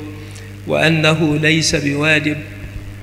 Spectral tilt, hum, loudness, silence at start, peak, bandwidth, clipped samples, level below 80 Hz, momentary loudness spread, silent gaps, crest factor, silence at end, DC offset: -4.5 dB/octave; 50 Hz at -35 dBFS; -14 LUFS; 0 s; 0 dBFS; 15 kHz; under 0.1%; -38 dBFS; 19 LU; none; 16 dB; 0 s; under 0.1%